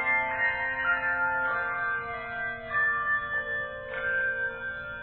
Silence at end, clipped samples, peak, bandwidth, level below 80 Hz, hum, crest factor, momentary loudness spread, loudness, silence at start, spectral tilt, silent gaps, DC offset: 0 s; under 0.1%; -14 dBFS; 4.3 kHz; -56 dBFS; none; 14 dB; 8 LU; -28 LUFS; 0 s; -7 dB/octave; none; under 0.1%